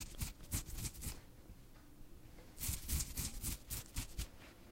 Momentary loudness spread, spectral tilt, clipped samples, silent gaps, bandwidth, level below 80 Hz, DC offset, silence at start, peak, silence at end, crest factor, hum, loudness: 20 LU; -3 dB/octave; under 0.1%; none; 16.5 kHz; -50 dBFS; under 0.1%; 0 s; -24 dBFS; 0 s; 22 dB; none; -44 LUFS